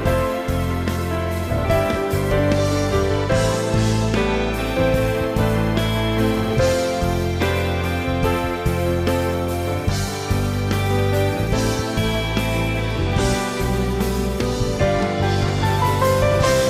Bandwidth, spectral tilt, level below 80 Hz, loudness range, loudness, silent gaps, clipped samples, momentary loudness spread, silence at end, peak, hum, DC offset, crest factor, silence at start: 16 kHz; -5.5 dB/octave; -30 dBFS; 2 LU; -20 LUFS; none; under 0.1%; 4 LU; 0 s; -6 dBFS; none; under 0.1%; 12 dB; 0 s